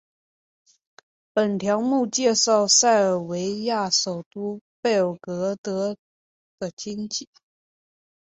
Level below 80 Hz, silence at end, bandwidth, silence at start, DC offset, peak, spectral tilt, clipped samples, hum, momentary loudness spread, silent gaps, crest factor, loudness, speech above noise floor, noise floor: -70 dBFS; 1.05 s; 8.4 kHz; 1.35 s; under 0.1%; -4 dBFS; -3 dB/octave; under 0.1%; none; 16 LU; 4.26-4.31 s, 4.61-4.83 s, 5.58-5.64 s, 5.98-6.58 s, 6.73-6.77 s; 20 dB; -22 LUFS; over 67 dB; under -90 dBFS